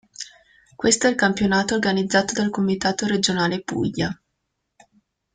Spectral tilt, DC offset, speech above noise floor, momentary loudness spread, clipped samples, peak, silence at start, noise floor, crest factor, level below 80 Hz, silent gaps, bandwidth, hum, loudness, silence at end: -4 dB/octave; under 0.1%; 56 dB; 10 LU; under 0.1%; -4 dBFS; 0.2 s; -76 dBFS; 20 dB; -54 dBFS; none; 9.8 kHz; none; -21 LUFS; 1.2 s